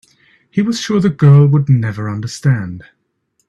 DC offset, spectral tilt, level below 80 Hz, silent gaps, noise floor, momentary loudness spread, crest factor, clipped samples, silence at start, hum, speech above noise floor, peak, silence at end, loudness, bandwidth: under 0.1%; -7.5 dB/octave; -50 dBFS; none; -65 dBFS; 13 LU; 14 dB; under 0.1%; 0.55 s; none; 53 dB; 0 dBFS; 0.65 s; -14 LUFS; 8.6 kHz